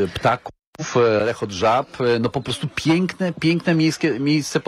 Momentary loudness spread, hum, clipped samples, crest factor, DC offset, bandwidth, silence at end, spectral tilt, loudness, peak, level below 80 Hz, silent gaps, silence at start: 7 LU; none; under 0.1%; 14 dB; under 0.1%; 13 kHz; 0.05 s; -5.5 dB/octave; -20 LUFS; -6 dBFS; -50 dBFS; 0.67-0.73 s; 0 s